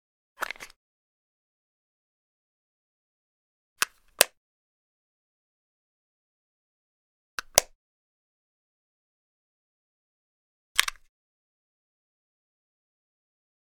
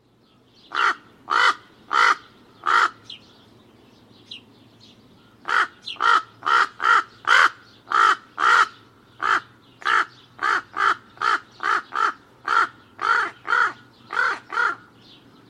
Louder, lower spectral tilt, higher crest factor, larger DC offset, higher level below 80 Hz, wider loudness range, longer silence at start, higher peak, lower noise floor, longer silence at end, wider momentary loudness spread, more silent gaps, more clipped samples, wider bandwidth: second, -26 LUFS vs -21 LUFS; second, 1 dB/octave vs -0.5 dB/octave; first, 36 dB vs 20 dB; neither; first, -62 dBFS vs -70 dBFS; about the same, 8 LU vs 7 LU; second, 0.4 s vs 0.7 s; about the same, 0 dBFS vs -2 dBFS; first, under -90 dBFS vs -58 dBFS; first, 2.85 s vs 0.75 s; first, 16 LU vs 12 LU; first, 0.76-3.76 s, 4.37-7.38 s, 7.75-10.75 s vs none; neither; first, 16.5 kHz vs 12.5 kHz